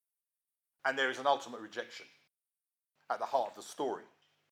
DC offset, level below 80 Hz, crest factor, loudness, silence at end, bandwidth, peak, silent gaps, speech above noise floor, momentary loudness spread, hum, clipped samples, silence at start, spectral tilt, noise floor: under 0.1%; under -90 dBFS; 24 dB; -36 LUFS; 0.45 s; 16 kHz; -14 dBFS; none; over 54 dB; 12 LU; none; under 0.1%; 0.85 s; -2.5 dB/octave; under -90 dBFS